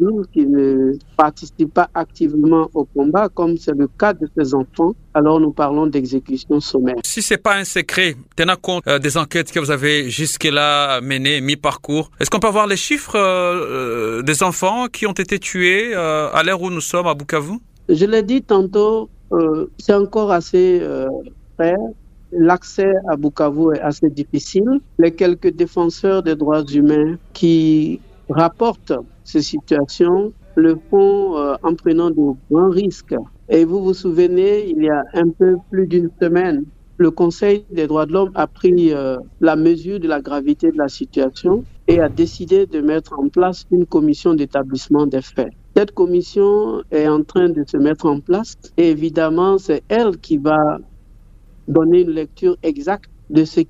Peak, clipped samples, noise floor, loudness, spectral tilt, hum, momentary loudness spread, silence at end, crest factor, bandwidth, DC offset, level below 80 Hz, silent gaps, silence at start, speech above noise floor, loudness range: 0 dBFS; under 0.1%; -43 dBFS; -16 LUFS; -5 dB/octave; none; 6 LU; 0.05 s; 16 dB; 15.5 kHz; under 0.1%; -44 dBFS; none; 0 s; 28 dB; 1 LU